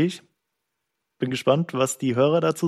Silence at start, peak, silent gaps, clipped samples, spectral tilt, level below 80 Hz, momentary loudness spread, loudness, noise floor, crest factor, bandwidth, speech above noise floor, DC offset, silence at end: 0 s; -6 dBFS; none; under 0.1%; -5.5 dB/octave; -68 dBFS; 9 LU; -23 LUFS; -80 dBFS; 18 dB; 14.5 kHz; 58 dB; under 0.1%; 0 s